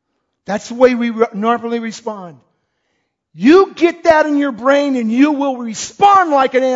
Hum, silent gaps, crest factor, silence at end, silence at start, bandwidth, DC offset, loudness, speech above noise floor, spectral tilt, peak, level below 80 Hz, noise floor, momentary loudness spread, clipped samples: none; none; 14 dB; 0 s; 0.5 s; 7.8 kHz; under 0.1%; -14 LUFS; 55 dB; -4.5 dB/octave; 0 dBFS; -56 dBFS; -68 dBFS; 14 LU; under 0.1%